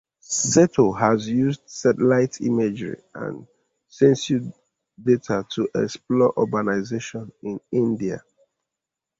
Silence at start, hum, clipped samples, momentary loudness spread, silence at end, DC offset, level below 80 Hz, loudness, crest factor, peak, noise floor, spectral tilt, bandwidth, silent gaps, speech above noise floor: 0.3 s; none; under 0.1%; 15 LU; 1 s; under 0.1%; -60 dBFS; -21 LUFS; 20 dB; -4 dBFS; -86 dBFS; -5.5 dB/octave; 8 kHz; none; 64 dB